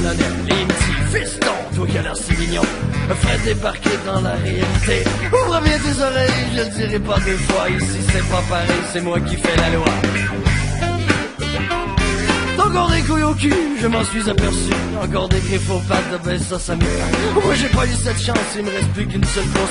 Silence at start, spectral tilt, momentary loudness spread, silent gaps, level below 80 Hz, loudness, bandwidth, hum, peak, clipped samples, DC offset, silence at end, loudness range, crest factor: 0 s; -5 dB/octave; 4 LU; none; -26 dBFS; -18 LUFS; 11 kHz; none; -2 dBFS; under 0.1%; under 0.1%; 0 s; 2 LU; 16 dB